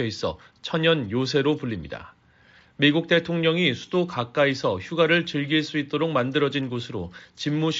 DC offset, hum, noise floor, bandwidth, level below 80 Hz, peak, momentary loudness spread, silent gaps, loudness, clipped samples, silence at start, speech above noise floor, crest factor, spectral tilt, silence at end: under 0.1%; none; -56 dBFS; 7.8 kHz; -58 dBFS; -6 dBFS; 11 LU; none; -24 LUFS; under 0.1%; 0 s; 32 dB; 18 dB; -4 dB/octave; 0 s